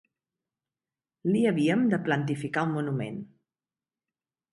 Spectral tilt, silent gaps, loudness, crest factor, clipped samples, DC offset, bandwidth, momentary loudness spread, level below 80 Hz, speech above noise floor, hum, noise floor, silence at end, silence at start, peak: -7.5 dB/octave; none; -27 LUFS; 18 dB; under 0.1%; under 0.1%; 11.5 kHz; 10 LU; -72 dBFS; over 64 dB; none; under -90 dBFS; 1.25 s; 1.25 s; -12 dBFS